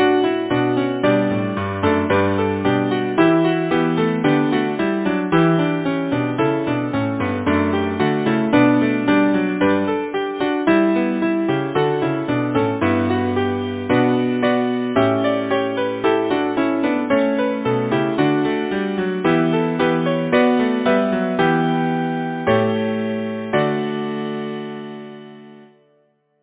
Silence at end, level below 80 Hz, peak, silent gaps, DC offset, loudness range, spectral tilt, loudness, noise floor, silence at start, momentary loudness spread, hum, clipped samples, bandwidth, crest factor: 0.8 s; -48 dBFS; -2 dBFS; none; under 0.1%; 2 LU; -11 dB/octave; -19 LUFS; -61 dBFS; 0 s; 6 LU; none; under 0.1%; 4 kHz; 18 dB